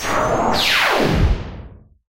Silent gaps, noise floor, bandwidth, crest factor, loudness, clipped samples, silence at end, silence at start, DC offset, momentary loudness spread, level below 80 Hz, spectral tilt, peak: none; -39 dBFS; 16 kHz; 14 dB; -17 LUFS; under 0.1%; 0.3 s; 0 s; under 0.1%; 10 LU; -26 dBFS; -4 dB/octave; -4 dBFS